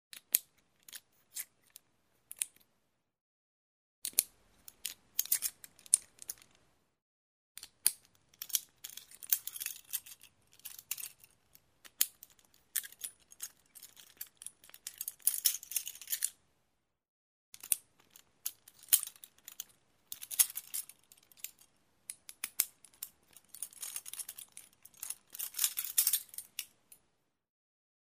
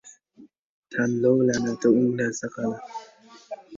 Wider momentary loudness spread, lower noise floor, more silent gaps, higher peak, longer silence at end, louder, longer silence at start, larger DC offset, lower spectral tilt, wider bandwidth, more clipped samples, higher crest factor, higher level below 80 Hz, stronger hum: about the same, 22 LU vs 20 LU; first, -81 dBFS vs -54 dBFS; first, 3.21-4.02 s, 7.02-7.55 s, 17.08-17.52 s vs 0.59-0.83 s; first, -2 dBFS vs -8 dBFS; first, 1.4 s vs 0 s; second, -35 LUFS vs -24 LUFS; about the same, 0.15 s vs 0.05 s; neither; second, 3.5 dB/octave vs -6 dB/octave; first, 16 kHz vs 7.6 kHz; neither; first, 38 dB vs 18 dB; second, -84 dBFS vs -64 dBFS; neither